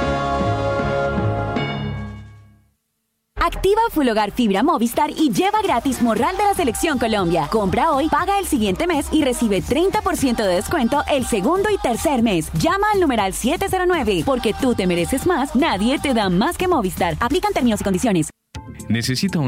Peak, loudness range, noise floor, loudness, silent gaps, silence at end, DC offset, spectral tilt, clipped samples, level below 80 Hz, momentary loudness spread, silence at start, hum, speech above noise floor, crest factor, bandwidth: -6 dBFS; 3 LU; -72 dBFS; -19 LUFS; none; 0 s; under 0.1%; -5 dB/octave; under 0.1%; -36 dBFS; 4 LU; 0 s; none; 54 dB; 12 dB; 16.5 kHz